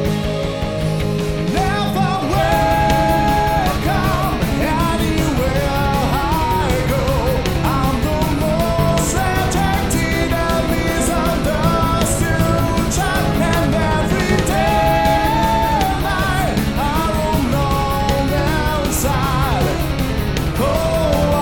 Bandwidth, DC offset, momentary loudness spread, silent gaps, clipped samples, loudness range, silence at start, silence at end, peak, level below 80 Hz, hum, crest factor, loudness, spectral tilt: 19 kHz; 1%; 3 LU; none; under 0.1%; 2 LU; 0 s; 0 s; -2 dBFS; -24 dBFS; none; 14 dB; -17 LUFS; -5.5 dB/octave